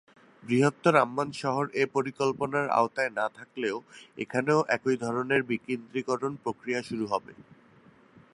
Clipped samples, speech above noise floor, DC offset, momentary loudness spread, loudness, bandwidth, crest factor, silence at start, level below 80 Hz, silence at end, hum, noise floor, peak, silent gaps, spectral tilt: under 0.1%; 29 dB; under 0.1%; 9 LU; -28 LUFS; 11.5 kHz; 24 dB; 0.45 s; -72 dBFS; 0.9 s; none; -58 dBFS; -6 dBFS; none; -6 dB/octave